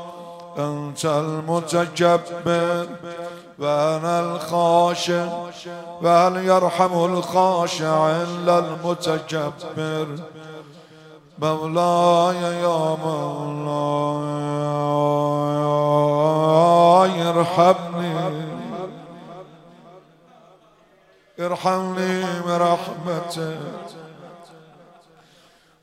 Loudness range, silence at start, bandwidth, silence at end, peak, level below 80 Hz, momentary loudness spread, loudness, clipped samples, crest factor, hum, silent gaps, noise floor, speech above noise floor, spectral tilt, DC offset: 9 LU; 0 s; 15.5 kHz; 1.25 s; -2 dBFS; -68 dBFS; 17 LU; -20 LUFS; under 0.1%; 20 dB; none; none; -55 dBFS; 35 dB; -6 dB/octave; under 0.1%